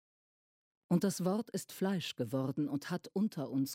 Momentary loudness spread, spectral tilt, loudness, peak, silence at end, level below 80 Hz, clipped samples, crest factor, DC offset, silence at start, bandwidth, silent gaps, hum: 5 LU; -6 dB/octave; -36 LUFS; -18 dBFS; 0 s; -82 dBFS; under 0.1%; 18 dB; under 0.1%; 0.9 s; 16.5 kHz; none; none